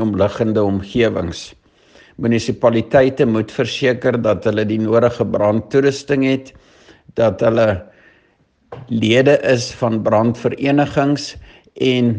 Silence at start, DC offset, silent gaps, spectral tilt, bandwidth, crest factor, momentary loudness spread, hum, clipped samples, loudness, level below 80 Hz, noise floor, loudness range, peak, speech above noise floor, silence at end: 0 s; under 0.1%; none; -6.5 dB/octave; 9.4 kHz; 16 dB; 9 LU; none; under 0.1%; -16 LUFS; -50 dBFS; -58 dBFS; 2 LU; 0 dBFS; 42 dB; 0 s